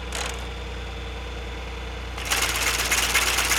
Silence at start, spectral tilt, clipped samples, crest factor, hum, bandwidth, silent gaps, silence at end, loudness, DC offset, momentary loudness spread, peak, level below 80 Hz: 0 s; -1 dB/octave; under 0.1%; 20 dB; none; over 20 kHz; none; 0 s; -25 LUFS; under 0.1%; 14 LU; -6 dBFS; -34 dBFS